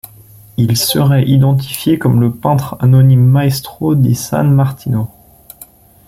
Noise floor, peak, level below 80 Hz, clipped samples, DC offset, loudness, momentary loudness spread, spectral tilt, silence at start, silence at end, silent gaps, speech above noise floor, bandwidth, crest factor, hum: -40 dBFS; 0 dBFS; -44 dBFS; under 0.1%; under 0.1%; -12 LUFS; 9 LU; -6.5 dB/octave; 0.05 s; 1 s; none; 29 dB; 16 kHz; 12 dB; none